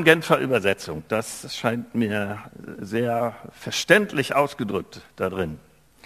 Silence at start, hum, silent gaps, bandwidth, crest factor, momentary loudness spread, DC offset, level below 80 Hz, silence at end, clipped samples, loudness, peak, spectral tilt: 0 s; none; none; 15 kHz; 24 dB; 16 LU; under 0.1%; -54 dBFS; 0.45 s; under 0.1%; -24 LUFS; 0 dBFS; -4.5 dB/octave